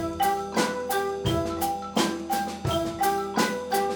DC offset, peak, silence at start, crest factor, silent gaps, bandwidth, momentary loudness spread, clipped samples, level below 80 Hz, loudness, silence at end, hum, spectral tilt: under 0.1%; -10 dBFS; 0 s; 16 dB; none; over 20 kHz; 3 LU; under 0.1%; -48 dBFS; -27 LUFS; 0 s; none; -4 dB/octave